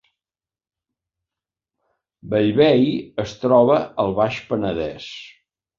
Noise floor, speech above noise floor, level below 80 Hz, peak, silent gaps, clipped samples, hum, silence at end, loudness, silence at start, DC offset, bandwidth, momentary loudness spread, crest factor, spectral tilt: under -90 dBFS; over 71 dB; -52 dBFS; -2 dBFS; none; under 0.1%; none; 0.5 s; -19 LUFS; 2.25 s; under 0.1%; 7.4 kHz; 14 LU; 18 dB; -7 dB/octave